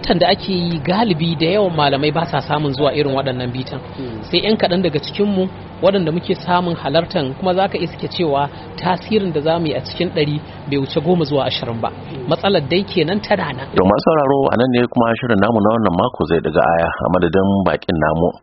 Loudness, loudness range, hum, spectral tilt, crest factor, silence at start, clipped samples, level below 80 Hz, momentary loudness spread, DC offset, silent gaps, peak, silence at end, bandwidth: -17 LUFS; 4 LU; none; -4.5 dB/octave; 16 dB; 0 s; under 0.1%; -42 dBFS; 7 LU; under 0.1%; none; 0 dBFS; 0.05 s; 6 kHz